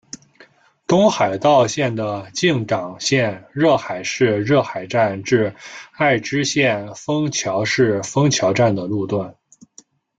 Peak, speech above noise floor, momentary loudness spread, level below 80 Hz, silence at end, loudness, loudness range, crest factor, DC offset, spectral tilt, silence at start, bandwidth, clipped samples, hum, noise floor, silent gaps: -2 dBFS; 33 dB; 9 LU; -58 dBFS; 0.9 s; -18 LUFS; 1 LU; 18 dB; under 0.1%; -5 dB/octave; 0.9 s; 9.2 kHz; under 0.1%; none; -51 dBFS; none